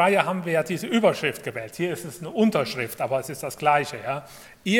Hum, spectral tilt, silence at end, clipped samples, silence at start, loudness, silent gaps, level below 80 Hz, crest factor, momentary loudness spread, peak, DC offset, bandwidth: none; -5 dB/octave; 0 s; under 0.1%; 0 s; -25 LUFS; none; -64 dBFS; 22 dB; 11 LU; -2 dBFS; under 0.1%; 17.5 kHz